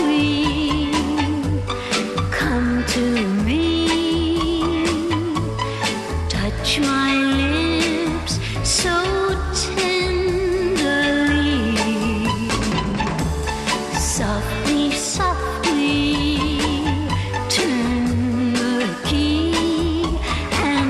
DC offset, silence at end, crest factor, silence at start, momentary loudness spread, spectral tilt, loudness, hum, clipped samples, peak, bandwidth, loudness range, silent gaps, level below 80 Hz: under 0.1%; 0 s; 12 dB; 0 s; 5 LU; -4.5 dB/octave; -20 LUFS; none; under 0.1%; -6 dBFS; 13.5 kHz; 2 LU; none; -30 dBFS